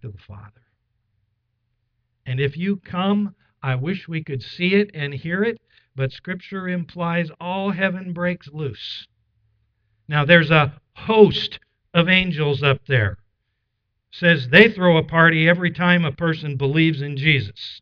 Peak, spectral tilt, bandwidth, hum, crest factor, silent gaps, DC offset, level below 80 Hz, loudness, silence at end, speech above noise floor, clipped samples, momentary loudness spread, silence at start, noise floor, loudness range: 0 dBFS; -8 dB/octave; 5.4 kHz; none; 20 dB; none; under 0.1%; -52 dBFS; -19 LUFS; 0.05 s; 55 dB; under 0.1%; 16 LU; 0 s; -74 dBFS; 10 LU